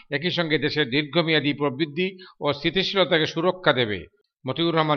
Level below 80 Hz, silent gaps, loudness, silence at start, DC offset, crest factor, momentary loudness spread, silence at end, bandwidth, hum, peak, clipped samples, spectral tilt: -58 dBFS; none; -23 LUFS; 0.1 s; under 0.1%; 20 dB; 8 LU; 0 s; 6.6 kHz; none; -4 dBFS; under 0.1%; -6 dB/octave